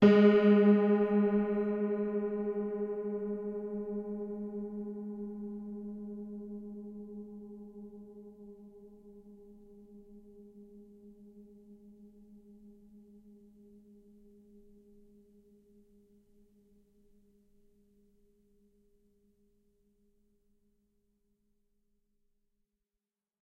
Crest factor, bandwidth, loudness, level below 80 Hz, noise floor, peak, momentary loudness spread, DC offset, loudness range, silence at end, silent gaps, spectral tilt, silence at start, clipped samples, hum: 24 dB; 5.2 kHz; -31 LUFS; -68 dBFS; under -90 dBFS; -10 dBFS; 29 LU; under 0.1%; 27 LU; 10.6 s; none; -9.5 dB/octave; 0 s; under 0.1%; none